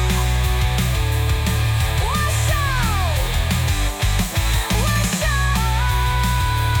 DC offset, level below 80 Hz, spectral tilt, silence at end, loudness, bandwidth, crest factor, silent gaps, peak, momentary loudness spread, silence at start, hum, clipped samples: under 0.1%; -22 dBFS; -4 dB/octave; 0 s; -19 LUFS; 19.5 kHz; 12 dB; none; -6 dBFS; 2 LU; 0 s; none; under 0.1%